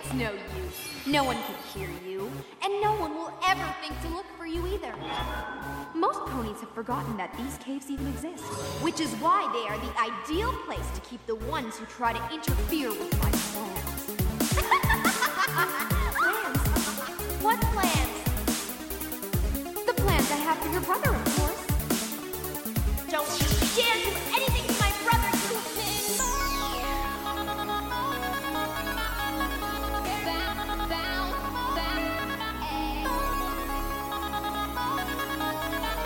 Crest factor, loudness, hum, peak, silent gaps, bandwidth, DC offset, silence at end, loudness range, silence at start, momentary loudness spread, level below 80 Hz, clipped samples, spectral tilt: 18 dB; -29 LUFS; none; -10 dBFS; none; 17 kHz; under 0.1%; 0 s; 5 LU; 0 s; 10 LU; -36 dBFS; under 0.1%; -4 dB/octave